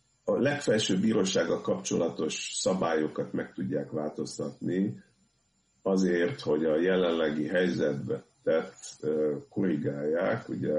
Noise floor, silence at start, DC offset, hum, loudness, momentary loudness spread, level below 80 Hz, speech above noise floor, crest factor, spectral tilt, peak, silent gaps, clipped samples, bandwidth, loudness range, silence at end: -71 dBFS; 0.25 s; under 0.1%; none; -29 LUFS; 9 LU; -66 dBFS; 43 dB; 14 dB; -5 dB/octave; -14 dBFS; none; under 0.1%; 11 kHz; 4 LU; 0 s